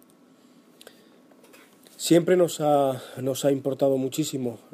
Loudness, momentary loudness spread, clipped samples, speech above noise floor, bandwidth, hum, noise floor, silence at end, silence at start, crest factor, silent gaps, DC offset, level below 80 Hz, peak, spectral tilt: -24 LUFS; 10 LU; under 0.1%; 33 dB; 15.5 kHz; none; -56 dBFS; 0.15 s; 2 s; 18 dB; none; under 0.1%; -74 dBFS; -8 dBFS; -5.5 dB/octave